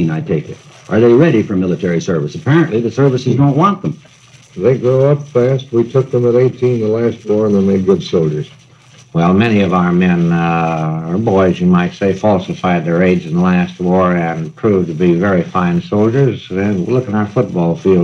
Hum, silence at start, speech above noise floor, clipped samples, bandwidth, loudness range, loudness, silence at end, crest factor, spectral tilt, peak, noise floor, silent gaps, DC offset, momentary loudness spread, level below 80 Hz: none; 0 s; 30 dB; under 0.1%; 7.2 kHz; 1 LU; -13 LUFS; 0 s; 12 dB; -8 dB/octave; 0 dBFS; -43 dBFS; none; under 0.1%; 6 LU; -50 dBFS